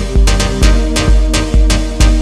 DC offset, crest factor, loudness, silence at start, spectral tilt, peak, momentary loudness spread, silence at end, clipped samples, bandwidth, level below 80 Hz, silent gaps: under 0.1%; 10 dB; -12 LUFS; 0 s; -4.5 dB/octave; 0 dBFS; 1 LU; 0 s; under 0.1%; 13 kHz; -10 dBFS; none